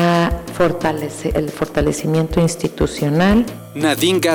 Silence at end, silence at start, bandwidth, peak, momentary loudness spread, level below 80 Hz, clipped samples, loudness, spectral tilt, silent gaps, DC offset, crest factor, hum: 0 s; 0 s; over 20 kHz; -4 dBFS; 6 LU; -32 dBFS; under 0.1%; -18 LUFS; -5.5 dB/octave; none; under 0.1%; 12 dB; none